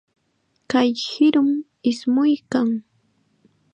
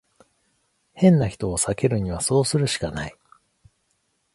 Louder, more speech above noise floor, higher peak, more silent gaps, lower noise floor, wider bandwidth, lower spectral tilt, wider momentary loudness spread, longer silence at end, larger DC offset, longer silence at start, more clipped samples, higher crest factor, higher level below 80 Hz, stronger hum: about the same, -20 LUFS vs -22 LUFS; about the same, 49 dB vs 50 dB; about the same, -6 dBFS vs -4 dBFS; neither; about the same, -68 dBFS vs -70 dBFS; second, 9 kHz vs 11.5 kHz; about the same, -5 dB/octave vs -5.5 dB/octave; second, 7 LU vs 11 LU; second, 0.95 s vs 1.25 s; neither; second, 0.7 s vs 0.95 s; neither; about the same, 16 dB vs 20 dB; second, -68 dBFS vs -46 dBFS; neither